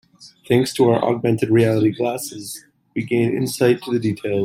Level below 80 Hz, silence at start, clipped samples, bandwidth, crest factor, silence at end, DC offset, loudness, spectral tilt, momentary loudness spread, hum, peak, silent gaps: -58 dBFS; 0.2 s; under 0.1%; 16 kHz; 16 dB; 0 s; under 0.1%; -19 LUFS; -6 dB/octave; 13 LU; none; -2 dBFS; none